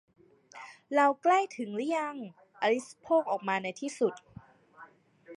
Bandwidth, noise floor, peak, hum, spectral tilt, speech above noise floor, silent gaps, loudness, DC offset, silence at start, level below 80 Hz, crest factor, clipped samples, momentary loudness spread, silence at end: 11.5 kHz; -56 dBFS; -12 dBFS; none; -4.5 dB/octave; 26 dB; none; -30 LUFS; under 0.1%; 0.55 s; -78 dBFS; 18 dB; under 0.1%; 21 LU; 0.05 s